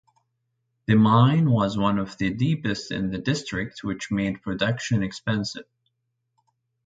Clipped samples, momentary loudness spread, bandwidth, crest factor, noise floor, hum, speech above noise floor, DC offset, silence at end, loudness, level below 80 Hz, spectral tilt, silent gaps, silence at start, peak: under 0.1%; 12 LU; 9.2 kHz; 20 dB; -77 dBFS; none; 54 dB; under 0.1%; 1.25 s; -24 LUFS; -52 dBFS; -6.5 dB/octave; none; 0.9 s; -6 dBFS